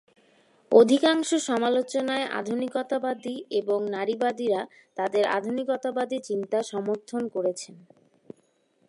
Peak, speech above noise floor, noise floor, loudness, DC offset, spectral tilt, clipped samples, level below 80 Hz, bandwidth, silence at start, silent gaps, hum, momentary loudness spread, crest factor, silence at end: -4 dBFS; 41 dB; -67 dBFS; -26 LUFS; under 0.1%; -4 dB/octave; under 0.1%; -80 dBFS; 11.5 kHz; 0.7 s; none; none; 10 LU; 22 dB; 1.1 s